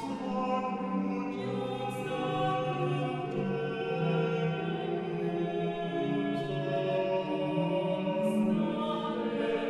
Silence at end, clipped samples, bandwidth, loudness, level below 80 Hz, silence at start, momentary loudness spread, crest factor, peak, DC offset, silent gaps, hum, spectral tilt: 0 s; under 0.1%; 12.5 kHz; -32 LUFS; -66 dBFS; 0 s; 4 LU; 14 dB; -18 dBFS; under 0.1%; none; none; -7.5 dB/octave